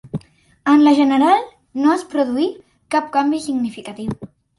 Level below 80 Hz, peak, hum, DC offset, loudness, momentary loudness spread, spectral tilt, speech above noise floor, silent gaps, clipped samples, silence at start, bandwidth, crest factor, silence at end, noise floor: -54 dBFS; -2 dBFS; none; under 0.1%; -17 LUFS; 16 LU; -5.5 dB/octave; 22 dB; none; under 0.1%; 0.05 s; 11.5 kHz; 16 dB; 0.35 s; -38 dBFS